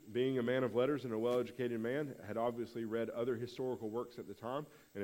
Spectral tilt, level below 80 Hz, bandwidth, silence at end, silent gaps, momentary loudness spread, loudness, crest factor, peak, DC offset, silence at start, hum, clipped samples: -7 dB/octave; -76 dBFS; 16 kHz; 0 s; none; 9 LU; -39 LUFS; 16 dB; -22 dBFS; under 0.1%; 0.05 s; none; under 0.1%